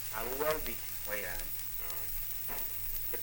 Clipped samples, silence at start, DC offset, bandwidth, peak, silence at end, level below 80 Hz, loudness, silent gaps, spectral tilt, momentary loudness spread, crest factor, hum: under 0.1%; 0 s; under 0.1%; 17 kHz; -16 dBFS; 0 s; -48 dBFS; -34 LUFS; none; -2.5 dB/octave; 3 LU; 20 dB; none